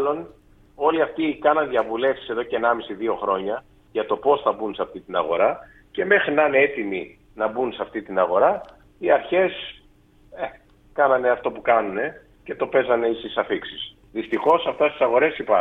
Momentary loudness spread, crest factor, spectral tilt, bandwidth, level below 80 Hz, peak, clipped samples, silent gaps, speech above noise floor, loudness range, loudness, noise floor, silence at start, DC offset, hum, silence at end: 14 LU; 18 dB; -7 dB/octave; 4.1 kHz; -56 dBFS; -4 dBFS; under 0.1%; none; 33 dB; 2 LU; -22 LUFS; -54 dBFS; 0 s; under 0.1%; none; 0 s